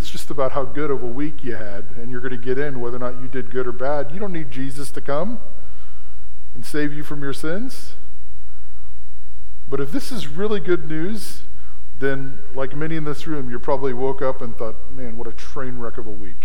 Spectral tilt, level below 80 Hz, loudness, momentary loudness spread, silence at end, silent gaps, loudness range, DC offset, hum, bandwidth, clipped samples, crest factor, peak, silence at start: -6.5 dB/octave; -42 dBFS; -27 LUFS; 22 LU; 0 s; none; 5 LU; 40%; none; 16.5 kHz; under 0.1%; 20 dB; -2 dBFS; 0 s